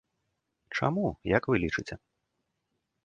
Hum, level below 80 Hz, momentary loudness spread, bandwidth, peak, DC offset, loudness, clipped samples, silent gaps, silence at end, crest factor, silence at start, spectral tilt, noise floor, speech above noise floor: none; -54 dBFS; 13 LU; 9.2 kHz; -8 dBFS; under 0.1%; -30 LUFS; under 0.1%; none; 1.1 s; 24 dB; 0.7 s; -7 dB/octave; -81 dBFS; 52 dB